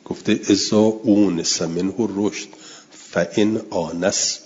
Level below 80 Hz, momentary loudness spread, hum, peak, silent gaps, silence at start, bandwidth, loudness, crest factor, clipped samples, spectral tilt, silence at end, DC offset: -60 dBFS; 10 LU; none; -4 dBFS; none; 0.1 s; 7.8 kHz; -20 LUFS; 16 dB; under 0.1%; -4 dB/octave; 0.05 s; under 0.1%